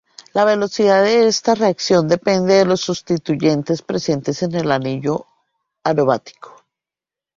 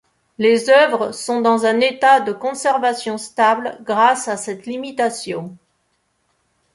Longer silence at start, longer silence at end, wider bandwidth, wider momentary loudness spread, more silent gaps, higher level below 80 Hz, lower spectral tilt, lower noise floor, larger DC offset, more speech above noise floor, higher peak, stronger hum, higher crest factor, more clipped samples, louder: about the same, 0.35 s vs 0.4 s; second, 0.9 s vs 1.2 s; second, 7.6 kHz vs 11.5 kHz; second, 8 LU vs 13 LU; neither; first, -56 dBFS vs -68 dBFS; first, -5 dB/octave vs -3 dB/octave; first, -89 dBFS vs -67 dBFS; neither; first, 72 dB vs 50 dB; about the same, -2 dBFS vs -2 dBFS; neither; about the same, 16 dB vs 16 dB; neither; about the same, -17 LUFS vs -17 LUFS